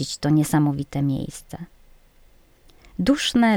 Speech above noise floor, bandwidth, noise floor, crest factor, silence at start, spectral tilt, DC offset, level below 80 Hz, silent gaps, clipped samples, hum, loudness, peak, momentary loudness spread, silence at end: 32 dB; 17.5 kHz; -53 dBFS; 16 dB; 0 s; -5.5 dB/octave; under 0.1%; -48 dBFS; none; under 0.1%; none; -22 LUFS; -6 dBFS; 20 LU; 0 s